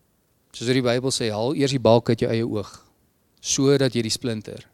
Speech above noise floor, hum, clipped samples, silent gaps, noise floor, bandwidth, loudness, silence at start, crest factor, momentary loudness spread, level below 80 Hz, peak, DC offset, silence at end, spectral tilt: 43 dB; none; under 0.1%; none; -65 dBFS; 14.5 kHz; -22 LUFS; 0.55 s; 20 dB; 13 LU; -56 dBFS; -2 dBFS; under 0.1%; 0.1 s; -5 dB/octave